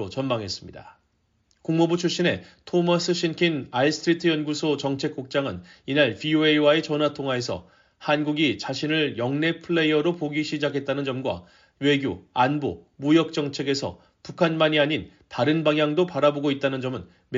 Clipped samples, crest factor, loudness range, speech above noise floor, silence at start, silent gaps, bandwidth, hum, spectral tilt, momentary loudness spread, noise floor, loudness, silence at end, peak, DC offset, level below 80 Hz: under 0.1%; 18 dB; 2 LU; 45 dB; 0 s; none; 7.6 kHz; none; -4 dB/octave; 11 LU; -69 dBFS; -24 LUFS; 0 s; -6 dBFS; under 0.1%; -62 dBFS